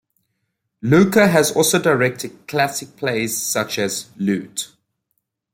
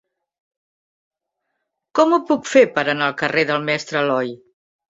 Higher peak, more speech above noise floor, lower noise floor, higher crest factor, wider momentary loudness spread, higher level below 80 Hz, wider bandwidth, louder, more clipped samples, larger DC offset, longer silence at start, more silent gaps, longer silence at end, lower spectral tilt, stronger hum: about the same, -2 dBFS vs -2 dBFS; second, 56 dB vs 60 dB; about the same, -74 dBFS vs -77 dBFS; about the same, 18 dB vs 18 dB; first, 14 LU vs 7 LU; first, -58 dBFS vs -66 dBFS; first, 16.5 kHz vs 7.8 kHz; about the same, -18 LUFS vs -18 LUFS; neither; neither; second, 0.85 s vs 1.95 s; neither; first, 0.85 s vs 0.55 s; about the same, -4 dB/octave vs -4.5 dB/octave; neither